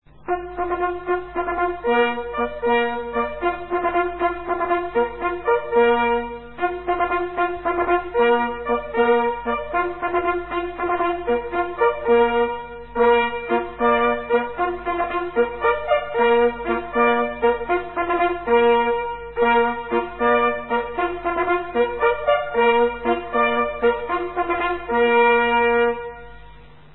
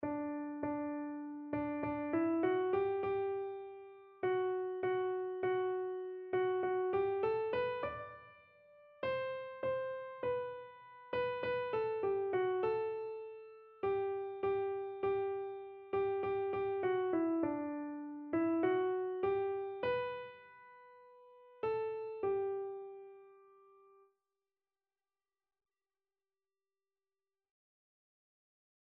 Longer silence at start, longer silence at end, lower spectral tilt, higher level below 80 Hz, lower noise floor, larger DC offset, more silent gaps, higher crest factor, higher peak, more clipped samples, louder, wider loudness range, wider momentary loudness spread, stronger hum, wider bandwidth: about the same, 0.05 s vs 0 s; second, 0.3 s vs 5.5 s; first, -9.5 dB/octave vs -5 dB/octave; first, -46 dBFS vs -72 dBFS; second, -45 dBFS vs under -90 dBFS; first, 0.5% vs under 0.1%; neither; about the same, 16 dB vs 16 dB; first, -4 dBFS vs -22 dBFS; neither; first, -21 LUFS vs -38 LUFS; second, 3 LU vs 6 LU; second, 8 LU vs 13 LU; neither; second, 4.1 kHz vs 4.8 kHz